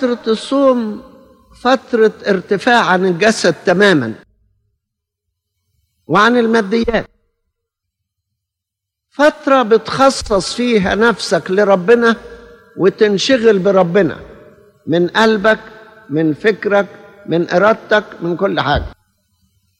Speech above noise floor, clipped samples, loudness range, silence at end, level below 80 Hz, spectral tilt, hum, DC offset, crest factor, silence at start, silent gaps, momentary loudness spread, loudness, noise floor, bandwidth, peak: 67 dB; under 0.1%; 4 LU; 0.85 s; -42 dBFS; -5 dB/octave; none; under 0.1%; 14 dB; 0 s; none; 9 LU; -13 LUFS; -80 dBFS; 12 kHz; 0 dBFS